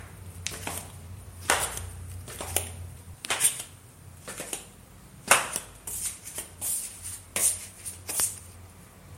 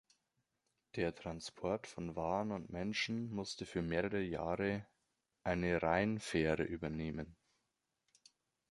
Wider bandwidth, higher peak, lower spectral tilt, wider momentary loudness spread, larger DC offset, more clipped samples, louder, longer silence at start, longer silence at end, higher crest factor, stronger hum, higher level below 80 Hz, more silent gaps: first, 16.5 kHz vs 11.5 kHz; first, -2 dBFS vs -18 dBFS; second, -1 dB/octave vs -5.5 dB/octave; first, 20 LU vs 10 LU; neither; neither; first, -29 LUFS vs -39 LUFS; second, 0 s vs 0.95 s; second, 0 s vs 1.4 s; first, 32 dB vs 22 dB; neither; first, -52 dBFS vs -60 dBFS; neither